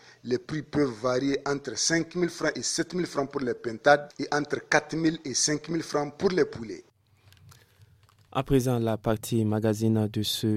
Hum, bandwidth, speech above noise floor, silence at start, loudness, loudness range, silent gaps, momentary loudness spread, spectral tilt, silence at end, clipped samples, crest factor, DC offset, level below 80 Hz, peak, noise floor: none; 16.5 kHz; 33 dB; 0.25 s; -27 LUFS; 4 LU; none; 7 LU; -4.5 dB/octave; 0 s; under 0.1%; 24 dB; under 0.1%; -54 dBFS; -4 dBFS; -60 dBFS